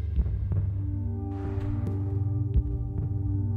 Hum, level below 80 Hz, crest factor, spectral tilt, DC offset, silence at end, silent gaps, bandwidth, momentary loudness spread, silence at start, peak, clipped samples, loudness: none; -32 dBFS; 14 dB; -11.5 dB/octave; under 0.1%; 0 s; none; 2.8 kHz; 4 LU; 0 s; -14 dBFS; under 0.1%; -30 LUFS